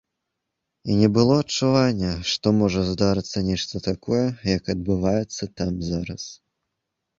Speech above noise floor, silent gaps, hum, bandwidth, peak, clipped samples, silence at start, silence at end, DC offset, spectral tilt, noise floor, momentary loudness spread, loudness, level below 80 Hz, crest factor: 59 dB; none; none; 7.8 kHz; -4 dBFS; under 0.1%; 0.85 s; 0.85 s; under 0.1%; -6 dB/octave; -81 dBFS; 9 LU; -22 LUFS; -44 dBFS; 20 dB